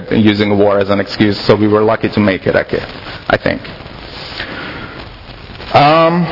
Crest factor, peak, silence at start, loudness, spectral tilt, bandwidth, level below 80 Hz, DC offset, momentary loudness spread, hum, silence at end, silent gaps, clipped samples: 14 dB; 0 dBFS; 0 s; -13 LUFS; -7.5 dB/octave; 6 kHz; -38 dBFS; under 0.1%; 19 LU; none; 0 s; none; 0.2%